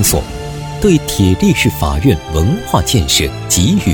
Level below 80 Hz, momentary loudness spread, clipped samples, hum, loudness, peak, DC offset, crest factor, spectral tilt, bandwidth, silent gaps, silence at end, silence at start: -24 dBFS; 6 LU; under 0.1%; none; -13 LUFS; 0 dBFS; under 0.1%; 12 dB; -4.5 dB/octave; over 20 kHz; none; 0 s; 0 s